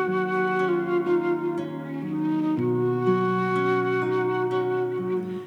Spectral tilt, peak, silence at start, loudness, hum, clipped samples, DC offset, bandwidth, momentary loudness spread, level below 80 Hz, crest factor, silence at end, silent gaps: -8.5 dB/octave; -10 dBFS; 0 s; -25 LUFS; none; under 0.1%; under 0.1%; 6.6 kHz; 5 LU; -72 dBFS; 14 dB; 0 s; none